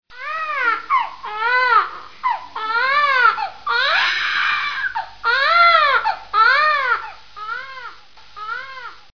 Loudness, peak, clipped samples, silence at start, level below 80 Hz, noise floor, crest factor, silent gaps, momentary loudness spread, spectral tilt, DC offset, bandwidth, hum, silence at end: -17 LUFS; -2 dBFS; under 0.1%; 0.1 s; -58 dBFS; -43 dBFS; 16 dB; none; 16 LU; -0.5 dB/octave; 0.7%; 5.4 kHz; none; 0.25 s